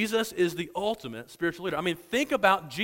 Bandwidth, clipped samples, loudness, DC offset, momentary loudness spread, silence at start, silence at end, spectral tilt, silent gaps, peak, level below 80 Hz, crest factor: 16.5 kHz; under 0.1%; -28 LUFS; under 0.1%; 8 LU; 0 s; 0 s; -4 dB/octave; none; -8 dBFS; -62 dBFS; 22 dB